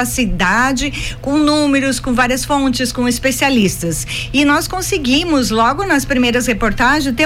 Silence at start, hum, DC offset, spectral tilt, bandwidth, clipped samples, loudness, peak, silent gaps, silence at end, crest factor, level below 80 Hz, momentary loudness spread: 0 s; none; under 0.1%; -3.5 dB/octave; 16.5 kHz; under 0.1%; -14 LUFS; -4 dBFS; none; 0 s; 12 dB; -30 dBFS; 5 LU